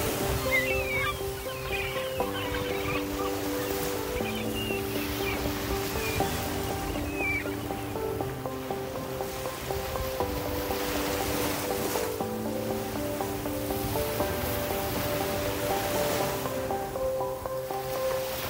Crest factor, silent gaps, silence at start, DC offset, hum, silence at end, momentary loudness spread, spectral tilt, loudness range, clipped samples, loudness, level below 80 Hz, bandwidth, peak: 16 dB; none; 0 s; under 0.1%; none; 0 s; 5 LU; -4 dB/octave; 3 LU; under 0.1%; -30 LUFS; -44 dBFS; 16.5 kHz; -14 dBFS